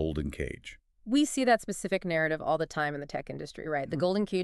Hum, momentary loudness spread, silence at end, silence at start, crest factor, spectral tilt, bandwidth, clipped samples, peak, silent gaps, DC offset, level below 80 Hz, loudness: none; 13 LU; 0 s; 0 s; 18 dB; -5 dB/octave; 13.5 kHz; under 0.1%; -12 dBFS; none; under 0.1%; -50 dBFS; -30 LUFS